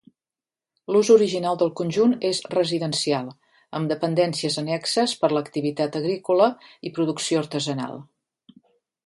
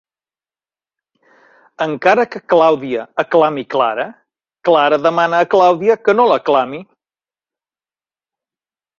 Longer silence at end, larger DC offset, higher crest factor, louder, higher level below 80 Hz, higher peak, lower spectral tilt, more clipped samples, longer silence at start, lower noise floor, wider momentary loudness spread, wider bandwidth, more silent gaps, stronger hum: second, 1.05 s vs 2.15 s; neither; about the same, 18 dB vs 16 dB; second, -23 LUFS vs -14 LUFS; second, -70 dBFS vs -64 dBFS; second, -4 dBFS vs 0 dBFS; about the same, -5 dB/octave vs -5.5 dB/octave; neither; second, 0.9 s vs 1.8 s; about the same, under -90 dBFS vs under -90 dBFS; about the same, 11 LU vs 10 LU; first, 11.5 kHz vs 7.2 kHz; neither; neither